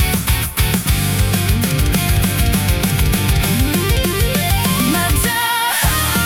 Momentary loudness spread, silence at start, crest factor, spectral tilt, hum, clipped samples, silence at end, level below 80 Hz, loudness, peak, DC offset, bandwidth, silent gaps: 2 LU; 0 s; 14 dB; -4 dB/octave; none; under 0.1%; 0 s; -22 dBFS; -15 LUFS; -2 dBFS; under 0.1%; 18 kHz; none